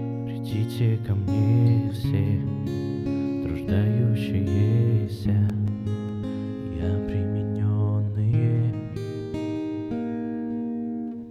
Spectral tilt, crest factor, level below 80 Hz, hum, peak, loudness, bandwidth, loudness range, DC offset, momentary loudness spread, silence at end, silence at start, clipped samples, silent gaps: -9.5 dB/octave; 14 dB; -46 dBFS; none; -10 dBFS; -25 LUFS; 6.6 kHz; 2 LU; under 0.1%; 9 LU; 0 s; 0 s; under 0.1%; none